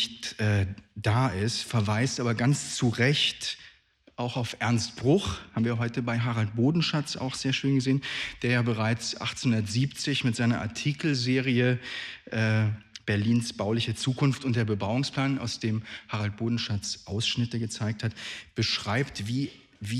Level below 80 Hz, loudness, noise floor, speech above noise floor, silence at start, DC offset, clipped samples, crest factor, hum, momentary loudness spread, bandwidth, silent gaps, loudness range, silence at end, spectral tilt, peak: -58 dBFS; -28 LUFS; -60 dBFS; 32 dB; 0 s; under 0.1%; under 0.1%; 16 dB; none; 8 LU; 12.5 kHz; none; 3 LU; 0 s; -5 dB/octave; -12 dBFS